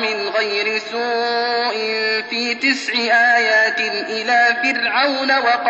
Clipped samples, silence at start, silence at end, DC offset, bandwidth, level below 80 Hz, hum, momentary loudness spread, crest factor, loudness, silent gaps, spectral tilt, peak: under 0.1%; 0 s; 0 s; under 0.1%; 8.2 kHz; -78 dBFS; none; 7 LU; 14 dB; -16 LUFS; none; -1.5 dB/octave; -4 dBFS